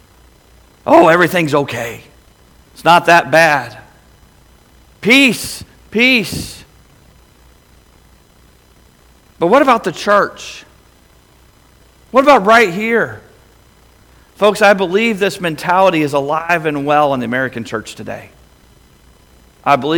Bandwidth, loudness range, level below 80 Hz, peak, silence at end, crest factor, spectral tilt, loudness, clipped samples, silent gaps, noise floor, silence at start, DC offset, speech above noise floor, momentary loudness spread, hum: 19.5 kHz; 6 LU; -48 dBFS; 0 dBFS; 0 s; 16 dB; -4.5 dB/octave; -12 LUFS; 0.1%; none; -48 dBFS; 0.85 s; under 0.1%; 35 dB; 17 LU; none